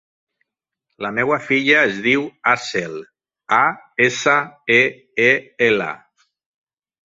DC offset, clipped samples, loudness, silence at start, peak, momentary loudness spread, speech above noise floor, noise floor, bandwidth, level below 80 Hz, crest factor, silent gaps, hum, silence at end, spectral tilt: under 0.1%; under 0.1%; -17 LUFS; 1 s; 0 dBFS; 10 LU; 62 dB; -80 dBFS; 8 kHz; -62 dBFS; 20 dB; none; none; 1.15 s; -4 dB/octave